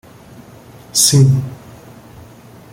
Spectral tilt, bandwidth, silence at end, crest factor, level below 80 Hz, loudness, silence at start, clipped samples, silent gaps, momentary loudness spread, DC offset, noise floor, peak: -4 dB/octave; 16.5 kHz; 1.2 s; 18 dB; -48 dBFS; -12 LUFS; 0.95 s; under 0.1%; none; 21 LU; under 0.1%; -40 dBFS; 0 dBFS